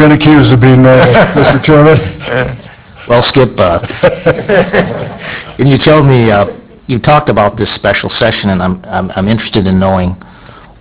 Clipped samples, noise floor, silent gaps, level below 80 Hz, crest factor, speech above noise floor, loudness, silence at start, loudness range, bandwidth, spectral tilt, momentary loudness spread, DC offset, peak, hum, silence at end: 3%; -34 dBFS; none; -30 dBFS; 8 dB; 26 dB; -8 LUFS; 0 s; 4 LU; 4 kHz; -11 dB/octave; 12 LU; under 0.1%; 0 dBFS; none; 0.65 s